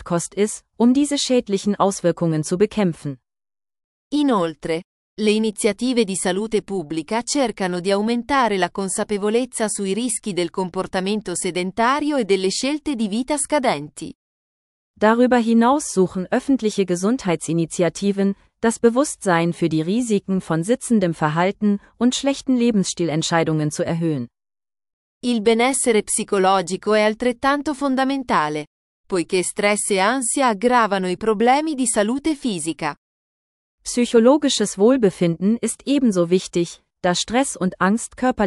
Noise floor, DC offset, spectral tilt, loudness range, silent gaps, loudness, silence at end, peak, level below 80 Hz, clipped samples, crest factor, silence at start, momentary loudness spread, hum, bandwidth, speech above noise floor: under -90 dBFS; under 0.1%; -4.5 dB/octave; 3 LU; 3.84-4.11 s, 4.84-5.17 s, 14.15-14.94 s, 24.93-25.21 s, 28.67-29.04 s, 32.97-33.78 s; -20 LUFS; 0 s; -2 dBFS; -54 dBFS; under 0.1%; 18 dB; 0 s; 7 LU; none; 13.5 kHz; over 71 dB